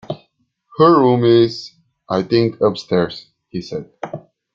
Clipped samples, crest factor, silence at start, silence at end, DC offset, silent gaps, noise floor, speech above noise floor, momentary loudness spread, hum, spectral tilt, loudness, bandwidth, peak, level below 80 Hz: under 0.1%; 16 dB; 0.1 s; 0.35 s; under 0.1%; none; -63 dBFS; 48 dB; 20 LU; none; -7.5 dB/octave; -16 LUFS; 7.4 kHz; -2 dBFS; -56 dBFS